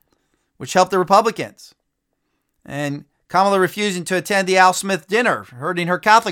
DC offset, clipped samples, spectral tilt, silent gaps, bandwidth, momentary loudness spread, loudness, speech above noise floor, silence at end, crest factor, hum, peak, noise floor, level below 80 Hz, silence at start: under 0.1%; under 0.1%; -4 dB/octave; none; 18 kHz; 14 LU; -17 LUFS; 56 dB; 0 s; 18 dB; none; 0 dBFS; -73 dBFS; -64 dBFS; 0.6 s